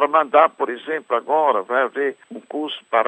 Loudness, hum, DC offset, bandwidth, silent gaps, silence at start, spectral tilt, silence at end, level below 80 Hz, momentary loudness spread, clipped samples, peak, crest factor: -20 LUFS; none; under 0.1%; 8.4 kHz; none; 0 s; -4.5 dB/octave; 0 s; -76 dBFS; 12 LU; under 0.1%; -2 dBFS; 18 dB